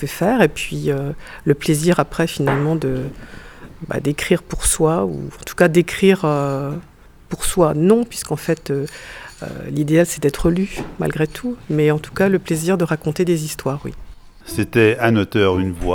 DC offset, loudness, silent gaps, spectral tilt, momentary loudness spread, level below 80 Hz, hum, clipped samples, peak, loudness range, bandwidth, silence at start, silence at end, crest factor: under 0.1%; -18 LUFS; none; -5.5 dB/octave; 14 LU; -36 dBFS; none; under 0.1%; 0 dBFS; 3 LU; 18.5 kHz; 0 s; 0 s; 18 dB